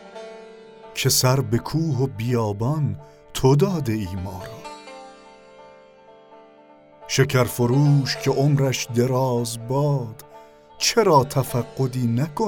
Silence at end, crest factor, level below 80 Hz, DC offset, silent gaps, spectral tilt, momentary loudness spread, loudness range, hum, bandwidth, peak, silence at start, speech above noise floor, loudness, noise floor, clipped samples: 0 s; 18 dB; -50 dBFS; under 0.1%; none; -5.5 dB/octave; 19 LU; 7 LU; none; 18 kHz; -4 dBFS; 0 s; 29 dB; -21 LUFS; -50 dBFS; under 0.1%